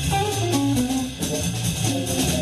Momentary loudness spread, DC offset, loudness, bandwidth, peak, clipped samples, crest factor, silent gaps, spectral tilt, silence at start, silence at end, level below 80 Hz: 4 LU; under 0.1%; -23 LUFS; 13.5 kHz; -8 dBFS; under 0.1%; 14 dB; none; -4.5 dB/octave; 0 s; 0 s; -38 dBFS